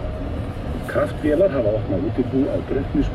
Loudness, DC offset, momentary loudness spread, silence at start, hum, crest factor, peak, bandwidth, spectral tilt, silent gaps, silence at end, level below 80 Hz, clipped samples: -22 LUFS; under 0.1%; 10 LU; 0 s; none; 14 dB; -8 dBFS; 13.5 kHz; -8.5 dB/octave; none; 0 s; -32 dBFS; under 0.1%